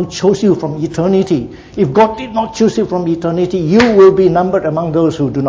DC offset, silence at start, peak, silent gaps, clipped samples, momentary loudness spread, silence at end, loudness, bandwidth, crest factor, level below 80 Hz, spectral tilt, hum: under 0.1%; 0 s; 0 dBFS; none; under 0.1%; 10 LU; 0 s; -12 LUFS; 7.8 kHz; 12 dB; -40 dBFS; -7 dB/octave; none